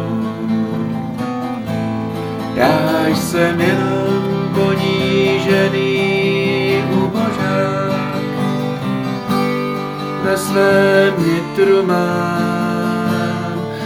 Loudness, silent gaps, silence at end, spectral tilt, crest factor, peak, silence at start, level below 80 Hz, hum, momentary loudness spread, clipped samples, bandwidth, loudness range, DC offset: -16 LUFS; none; 0 s; -6 dB/octave; 16 dB; 0 dBFS; 0 s; -50 dBFS; none; 8 LU; under 0.1%; 18 kHz; 3 LU; 0.1%